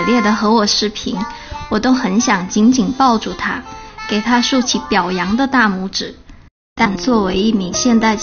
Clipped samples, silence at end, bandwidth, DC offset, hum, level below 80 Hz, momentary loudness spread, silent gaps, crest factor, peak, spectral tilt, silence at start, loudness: under 0.1%; 0 s; 6.8 kHz; under 0.1%; none; -40 dBFS; 9 LU; 6.51-6.76 s; 14 dB; 0 dBFS; -3 dB/octave; 0 s; -15 LUFS